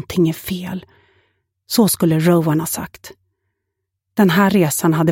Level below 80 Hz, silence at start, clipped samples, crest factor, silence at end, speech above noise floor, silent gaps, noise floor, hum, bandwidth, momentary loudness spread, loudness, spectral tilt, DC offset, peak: -52 dBFS; 0 s; under 0.1%; 16 dB; 0 s; 61 dB; none; -77 dBFS; none; 17 kHz; 12 LU; -16 LUFS; -5.5 dB/octave; under 0.1%; -2 dBFS